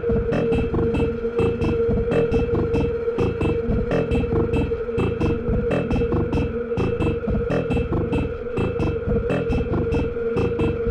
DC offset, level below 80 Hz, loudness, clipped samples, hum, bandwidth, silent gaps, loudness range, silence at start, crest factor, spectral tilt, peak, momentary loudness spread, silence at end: under 0.1%; -30 dBFS; -22 LUFS; under 0.1%; none; 9 kHz; none; 2 LU; 0 s; 12 dB; -9 dB/octave; -10 dBFS; 3 LU; 0 s